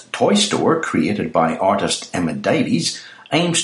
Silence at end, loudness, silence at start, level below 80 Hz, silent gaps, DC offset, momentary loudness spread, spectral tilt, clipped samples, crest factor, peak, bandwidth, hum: 0 s; -18 LUFS; 0 s; -54 dBFS; none; under 0.1%; 6 LU; -4 dB/octave; under 0.1%; 16 dB; -2 dBFS; 11.5 kHz; none